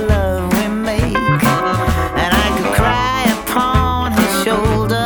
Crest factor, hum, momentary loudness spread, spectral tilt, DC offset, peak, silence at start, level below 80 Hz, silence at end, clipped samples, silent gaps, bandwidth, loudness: 14 dB; none; 3 LU; -5 dB/octave; under 0.1%; 0 dBFS; 0 s; -24 dBFS; 0 s; under 0.1%; none; over 20 kHz; -15 LUFS